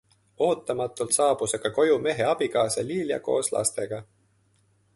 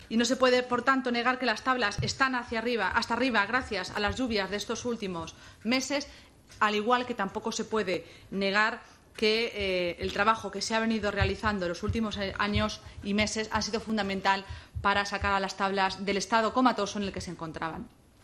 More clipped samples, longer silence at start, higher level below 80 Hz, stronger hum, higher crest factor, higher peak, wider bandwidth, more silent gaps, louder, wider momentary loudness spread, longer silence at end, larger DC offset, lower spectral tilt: neither; first, 0.4 s vs 0 s; second, -64 dBFS vs -50 dBFS; neither; about the same, 18 dB vs 20 dB; about the same, -8 dBFS vs -10 dBFS; second, 12 kHz vs 14 kHz; neither; first, -25 LUFS vs -29 LUFS; second, 7 LU vs 10 LU; first, 0.95 s vs 0.35 s; neither; about the same, -3.5 dB/octave vs -4 dB/octave